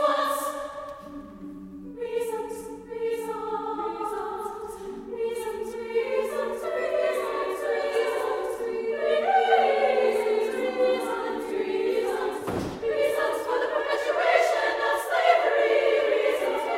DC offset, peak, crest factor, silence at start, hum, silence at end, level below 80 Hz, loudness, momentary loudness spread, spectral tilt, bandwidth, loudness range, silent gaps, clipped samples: under 0.1%; -6 dBFS; 20 dB; 0 s; none; 0 s; -60 dBFS; -26 LUFS; 15 LU; -3.5 dB/octave; 16 kHz; 9 LU; none; under 0.1%